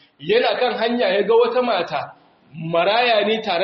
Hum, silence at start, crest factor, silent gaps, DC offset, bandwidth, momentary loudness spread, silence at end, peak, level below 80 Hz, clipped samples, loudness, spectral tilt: none; 0.2 s; 14 dB; none; under 0.1%; 6.2 kHz; 10 LU; 0 s; -6 dBFS; -66 dBFS; under 0.1%; -18 LUFS; -2 dB/octave